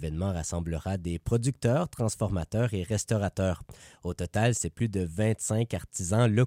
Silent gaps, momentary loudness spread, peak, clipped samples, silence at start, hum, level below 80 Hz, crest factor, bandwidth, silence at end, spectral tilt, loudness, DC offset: none; 6 LU; -14 dBFS; under 0.1%; 0 s; none; -46 dBFS; 14 dB; 16 kHz; 0 s; -6 dB/octave; -29 LUFS; under 0.1%